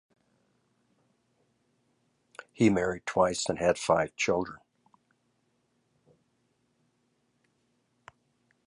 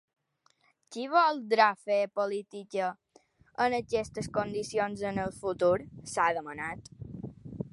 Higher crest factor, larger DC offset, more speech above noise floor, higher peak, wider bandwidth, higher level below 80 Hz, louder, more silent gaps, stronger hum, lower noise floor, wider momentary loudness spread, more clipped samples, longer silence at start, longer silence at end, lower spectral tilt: about the same, 24 dB vs 22 dB; neither; first, 47 dB vs 41 dB; about the same, -10 dBFS vs -8 dBFS; about the same, 11.5 kHz vs 11.5 kHz; about the same, -62 dBFS vs -62 dBFS; about the same, -28 LUFS vs -30 LUFS; neither; first, 60 Hz at -65 dBFS vs none; about the same, -74 dBFS vs -71 dBFS; second, 6 LU vs 18 LU; neither; first, 2.6 s vs 0.9 s; first, 4.1 s vs 0.05 s; about the same, -4.5 dB/octave vs -5 dB/octave